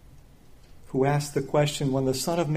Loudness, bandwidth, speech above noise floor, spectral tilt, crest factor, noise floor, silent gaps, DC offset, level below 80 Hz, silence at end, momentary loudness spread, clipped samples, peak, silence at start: -26 LUFS; 15.5 kHz; 26 dB; -5.5 dB/octave; 16 dB; -50 dBFS; none; under 0.1%; -52 dBFS; 0 s; 2 LU; under 0.1%; -10 dBFS; 0.15 s